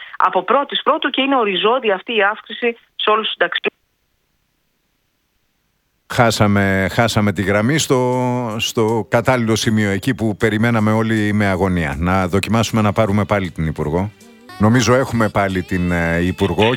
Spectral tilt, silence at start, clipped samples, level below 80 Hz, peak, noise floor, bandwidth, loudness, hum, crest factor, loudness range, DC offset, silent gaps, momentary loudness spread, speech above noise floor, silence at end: -5.5 dB/octave; 0 s; under 0.1%; -40 dBFS; 0 dBFS; -66 dBFS; 17.5 kHz; -17 LUFS; none; 16 dB; 5 LU; under 0.1%; none; 5 LU; 50 dB; 0 s